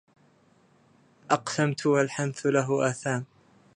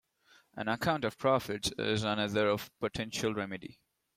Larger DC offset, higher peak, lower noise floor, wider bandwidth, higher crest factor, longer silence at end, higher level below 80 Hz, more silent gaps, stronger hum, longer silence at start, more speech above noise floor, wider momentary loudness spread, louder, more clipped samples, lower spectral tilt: neither; first, -6 dBFS vs -14 dBFS; second, -62 dBFS vs -66 dBFS; second, 11 kHz vs 16 kHz; about the same, 22 dB vs 20 dB; about the same, 0.55 s vs 0.45 s; second, -74 dBFS vs -62 dBFS; neither; neither; first, 1.3 s vs 0.55 s; about the same, 36 dB vs 33 dB; second, 7 LU vs 10 LU; first, -27 LUFS vs -33 LUFS; neither; about the same, -5.5 dB/octave vs -4.5 dB/octave